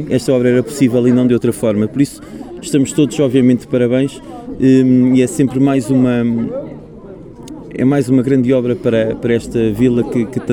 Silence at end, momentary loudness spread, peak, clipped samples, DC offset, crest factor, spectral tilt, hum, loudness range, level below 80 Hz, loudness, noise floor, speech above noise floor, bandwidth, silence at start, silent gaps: 0 s; 19 LU; 0 dBFS; under 0.1%; under 0.1%; 14 dB; -7 dB/octave; none; 3 LU; -44 dBFS; -14 LUFS; -33 dBFS; 20 dB; 15 kHz; 0 s; none